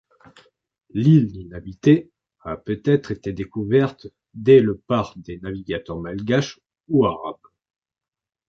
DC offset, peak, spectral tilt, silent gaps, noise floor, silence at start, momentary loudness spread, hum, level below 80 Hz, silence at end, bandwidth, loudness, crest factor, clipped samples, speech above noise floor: under 0.1%; -2 dBFS; -8 dB/octave; none; -55 dBFS; 0.95 s; 18 LU; none; -50 dBFS; 1.15 s; 6.8 kHz; -20 LUFS; 18 dB; under 0.1%; 35 dB